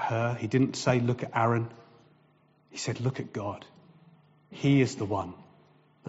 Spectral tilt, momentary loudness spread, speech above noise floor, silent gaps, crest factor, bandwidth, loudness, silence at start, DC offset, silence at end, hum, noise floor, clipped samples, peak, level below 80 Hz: -6 dB/octave; 15 LU; 36 dB; none; 18 dB; 8 kHz; -29 LUFS; 0 s; under 0.1%; 0 s; none; -64 dBFS; under 0.1%; -12 dBFS; -66 dBFS